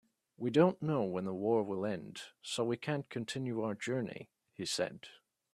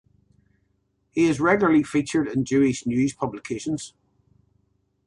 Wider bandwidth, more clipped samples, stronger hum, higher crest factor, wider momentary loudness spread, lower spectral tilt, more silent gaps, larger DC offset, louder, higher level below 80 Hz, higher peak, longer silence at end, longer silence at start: first, 14 kHz vs 11.5 kHz; neither; second, none vs 50 Hz at -55 dBFS; about the same, 22 dB vs 18 dB; first, 17 LU vs 12 LU; about the same, -5.5 dB/octave vs -6 dB/octave; neither; neither; second, -36 LUFS vs -23 LUFS; second, -76 dBFS vs -56 dBFS; second, -14 dBFS vs -6 dBFS; second, 0.4 s vs 1.2 s; second, 0.4 s vs 1.15 s